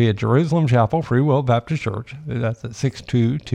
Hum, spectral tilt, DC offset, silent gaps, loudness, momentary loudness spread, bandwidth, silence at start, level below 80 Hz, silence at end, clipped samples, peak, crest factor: none; -7.5 dB/octave; under 0.1%; none; -20 LUFS; 8 LU; 9 kHz; 0 s; -48 dBFS; 0 s; under 0.1%; -4 dBFS; 16 dB